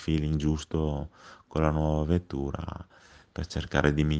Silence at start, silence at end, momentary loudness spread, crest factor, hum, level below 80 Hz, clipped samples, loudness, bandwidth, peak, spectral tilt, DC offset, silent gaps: 0 s; 0 s; 14 LU; 22 dB; none; -38 dBFS; under 0.1%; -29 LUFS; 8.4 kHz; -6 dBFS; -7 dB/octave; under 0.1%; none